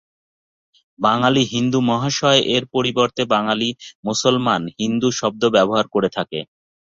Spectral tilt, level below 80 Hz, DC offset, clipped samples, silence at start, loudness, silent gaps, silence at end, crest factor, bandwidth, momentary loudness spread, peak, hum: -4.5 dB/octave; -58 dBFS; under 0.1%; under 0.1%; 1 s; -18 LUFS; 3.95-4.03 s; 0.4 s; 18 dB; 7.8 kHz; 7 LU; -2 dBFS; none